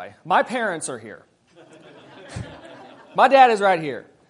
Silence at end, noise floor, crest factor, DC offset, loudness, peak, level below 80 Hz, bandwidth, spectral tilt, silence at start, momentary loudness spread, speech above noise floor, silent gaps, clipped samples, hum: 0.3 s; -50 dBFS; 22 dB; under 0.1%; -19 LUFS; 0 dBFS; -60 dBFS; 11 kHz; -4 dB/octave; 0 s; 23 LU; 31 dB; none; under 0.1%; none